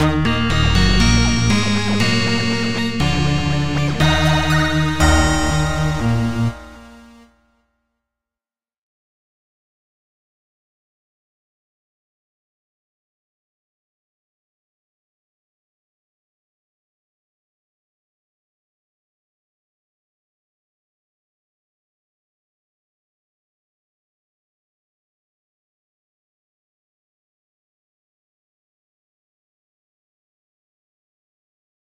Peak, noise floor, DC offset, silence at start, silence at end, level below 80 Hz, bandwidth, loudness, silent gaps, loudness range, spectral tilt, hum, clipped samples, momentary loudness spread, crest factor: 0 dBFS; under -90 dBFS; 4%; 0 s; 23.15 s; -32 dBFS; 15.5 kHz; -17 LUFS; none; 9 LU; -5 dB/octave; none; under 0.1%; 5 LU; 22 dB